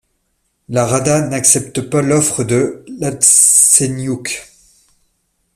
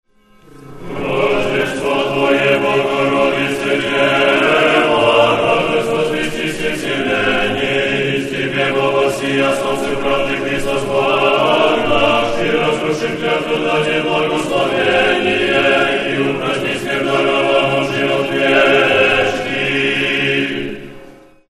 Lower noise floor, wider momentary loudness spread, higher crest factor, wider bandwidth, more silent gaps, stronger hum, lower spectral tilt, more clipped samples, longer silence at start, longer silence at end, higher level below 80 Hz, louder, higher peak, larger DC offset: first, -66 dBFS vs -46 dBFS; first, 16 LU vs 7 LU; about the same, 16 dB vs 16 dB; first, over 20 kHz vs 13 kHz; neither; neither; about the same, -3.5 dB/octave vs -4.5 dB/octave; neither; first, 0.7 s vs 0.55 s; first, 1.15 s vs 0.35 s; second, -50 dBFS vs -42 dBFS; first, -12 LUFS vs -15 LUFS; about the same, 0 dBFS vs 0 dBFS; neither